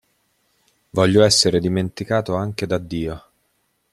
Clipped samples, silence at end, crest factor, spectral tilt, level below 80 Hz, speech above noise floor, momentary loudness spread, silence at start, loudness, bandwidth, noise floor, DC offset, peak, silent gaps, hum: under 0.1%; 0.75 s; 20 dB; -4.5 dB/octave; -48 dBFS; 49 dB; 14 LU; 0.95 s; -19 LUFS; 14 kHz; -68 dBFS; under 0.1%; 0 dBFS; none; none